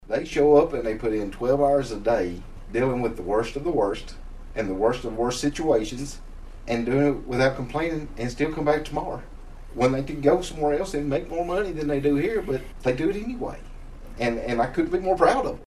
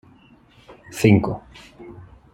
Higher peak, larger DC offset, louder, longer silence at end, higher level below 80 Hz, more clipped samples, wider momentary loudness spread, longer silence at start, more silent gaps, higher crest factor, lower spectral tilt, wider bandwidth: about the same, -4 dBFS vs -2 dBFS; neither; second, -25 LUFS vs -19 LUFS; second, 0 s vs 0.35 s; first, -38 dBFS vs -50 dBFS; neither; second, 13 LU vs 25 LU; second, 0 s vs 0.7 s; neither; about the same, 20 dB vs 22 dB; about the same, -6 dB/octave vs -7 dB/octave; second, 13 kHz vs 14.5 kHz